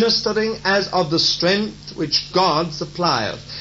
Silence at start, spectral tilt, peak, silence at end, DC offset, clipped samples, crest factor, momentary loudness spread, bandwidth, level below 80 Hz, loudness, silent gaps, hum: 0 s; -4 dB/octave; -4 dBFS; 0 s; under 0.1%; under 0.1%; 16 dB; 9 LU; 8 kHz; -48 dBFS; -19 LUFS; none; none